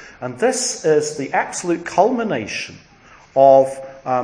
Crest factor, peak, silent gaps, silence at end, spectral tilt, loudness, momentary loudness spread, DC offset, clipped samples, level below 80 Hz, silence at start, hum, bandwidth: 18 dB; 0 dBFS; none; 0 s; -4 dB/octave; -18 LUFS; 15 LU; under 0.1%; under 0.1%; -58 dBFS; 0 s; none; 10.5 kHz